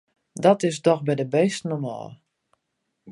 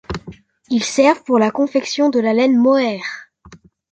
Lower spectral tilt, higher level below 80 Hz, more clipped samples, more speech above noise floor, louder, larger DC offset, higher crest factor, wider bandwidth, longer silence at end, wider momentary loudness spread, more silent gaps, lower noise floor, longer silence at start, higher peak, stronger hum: first, -6 dB/octave vs -4.5 dB/octave; second, -72 dBFS vs -48 dBFS; neither; first, 56 dB vs 30 dB; second, -23 LUFS vs -16 LUFS; neither; first, 22 dB vs 16 dB; first, 11.5 kHz vs 9 kHz; second, 0 s vs 0.35 s; first, 18 LU vs 15 LU; neither; first, -77 dBFS vs -45 dBFS; first, 0.35 s vs 0.1 s; about the same, -4 dBFS vs -2 dBFS; neither